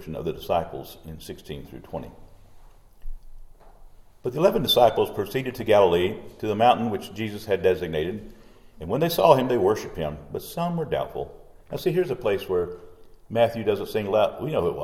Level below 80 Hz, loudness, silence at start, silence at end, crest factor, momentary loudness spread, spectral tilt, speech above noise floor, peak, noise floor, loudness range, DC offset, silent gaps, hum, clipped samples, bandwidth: -48 dBFS; -24 LUFS; 0 s; 0 s; 22 dB; 19 LU; -6 dB/octave; 24 dB; -2 dBFS; -48 dBFS; 12 LU; under 0.1%; none; none; under 0.1%; 17 kHz